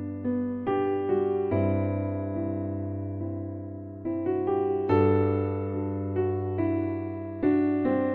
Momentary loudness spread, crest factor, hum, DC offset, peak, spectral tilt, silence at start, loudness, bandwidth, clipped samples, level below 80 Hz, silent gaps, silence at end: 9 LU; 16 dB; none; under 0.1%; -10 dBFS; -12 dB/octave; 0 s; -28 LUFS; 4.3 kHz; under 0.1%; -62 dBFS; none; 0 s